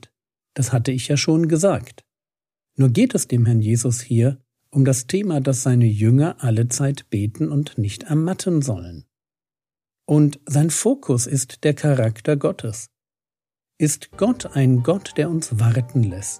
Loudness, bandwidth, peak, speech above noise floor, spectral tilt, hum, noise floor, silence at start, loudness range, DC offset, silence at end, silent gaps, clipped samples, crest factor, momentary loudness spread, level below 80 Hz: -20 LUFS; 15 kHz; -4 dBFS; over 71 dB; -6 dB/octave; none; under -90 dBFS; 0.55 s; 4 LU; under 0.1%; 0 s; none; under 0.1%; 16 dB; 8 LU; -56 dBFS